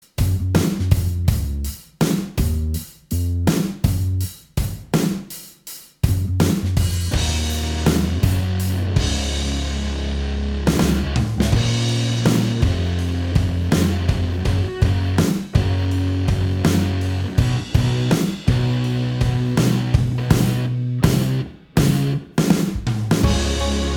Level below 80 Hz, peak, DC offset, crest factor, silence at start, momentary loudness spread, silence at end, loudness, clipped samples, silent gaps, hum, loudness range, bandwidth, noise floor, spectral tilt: -28 dBFS; 0 dBFS; under 0.1%; 18 dB; 0.2 s; 6 LU; 0 s; -20 LUFS; under 0.1%; none; none; 3 LU; 20 kHz; -40 dBFS; -6 dB/octave